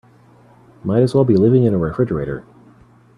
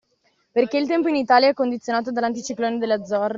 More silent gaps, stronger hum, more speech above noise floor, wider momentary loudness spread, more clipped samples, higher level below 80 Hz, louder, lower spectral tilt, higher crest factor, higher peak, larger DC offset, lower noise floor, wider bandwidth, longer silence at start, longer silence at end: neither; neither; second, 33 dB vs 46 dB; first, 15 LU vs 9 LU; neither; first, -46 dBFS vs -68 dBFS; first, -16 LUFS vs -21 LUFS; first, -9.5 dB/octave vs -2.5 dB/octave; about the same, 16 dB vs 18 dB; about the same, -2 dBFS vs -4 dBFS; neither; second, -48 dBFS vs -66 dBFS; first, 10.5 kHz vs 7.6 kHz; first, 0.85 s vs 0.55 s; first, 0.75 s vs 0 s